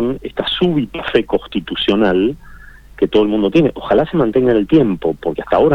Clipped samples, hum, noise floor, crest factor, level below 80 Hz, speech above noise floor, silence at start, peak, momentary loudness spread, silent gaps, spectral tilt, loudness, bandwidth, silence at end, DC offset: under 0.1%; none; -38 dBFS; 14 dB; -40 dBFS; 23 dB; 0 s; -2 dBFS; 7 LU; none; -8 dB/octave; -16 LUFS; 6.6 kHz; 0 s; under 0.1%